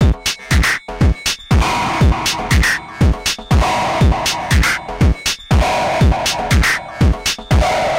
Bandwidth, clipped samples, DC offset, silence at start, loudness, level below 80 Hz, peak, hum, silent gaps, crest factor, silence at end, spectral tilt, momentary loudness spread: 16.5 kHz; under 0.1%; under 0.1%; 0 s; -15 LUFS; -20 dBFS; -2 dBFS; none; none; 14 dB; 0 s; -4.5 dB/octave; 3 LU